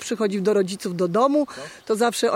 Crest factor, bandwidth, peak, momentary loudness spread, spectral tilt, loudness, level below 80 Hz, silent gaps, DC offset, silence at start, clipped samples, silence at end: 14 dB; 16.5 kHz; -8 dBFS; 8 LU; -5 dB/octave; -22 LUFS; -68 dBFS; none; under 0.1%; 0 s; under 0.1%; 0 s